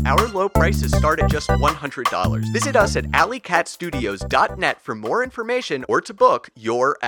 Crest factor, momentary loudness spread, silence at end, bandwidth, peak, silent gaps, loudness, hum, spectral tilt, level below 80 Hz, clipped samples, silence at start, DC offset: 20 dB; 6 LU; 0 s; over 20 kHz; 0 dBFS; none; -20 LUFS; none; -5 dB/octave; -30 dBFS; under 0.1%; 0 s; under 0.1%